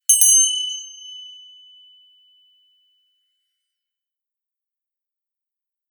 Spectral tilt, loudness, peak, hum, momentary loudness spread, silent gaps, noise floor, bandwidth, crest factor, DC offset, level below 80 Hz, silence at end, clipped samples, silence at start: 12.5 dB/octave; -13 LUFS; 0 dBFS; none; 26 LU; none; -86 dBFS; over 20 kHz; 24 dB; under 0.1%; under -90 dBFS; 4.6 s; under 0.1%; 0.1 s